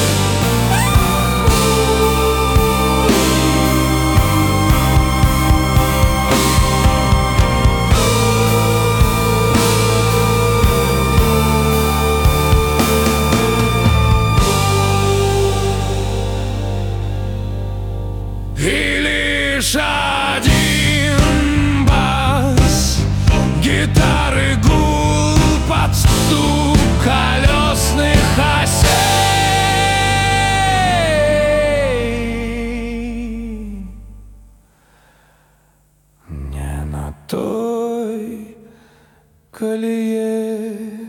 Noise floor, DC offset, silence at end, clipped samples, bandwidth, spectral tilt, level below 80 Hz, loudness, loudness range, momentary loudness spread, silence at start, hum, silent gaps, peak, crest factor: -55 dBFS; under 0.1%; 0 s; under 0.1%; 19 kHz; -4.5 dB/octave; -22 dBFS; -15 LUFS; 11 LU; 11 LU; 0 s; none; none; 0 dBFS; 14 dB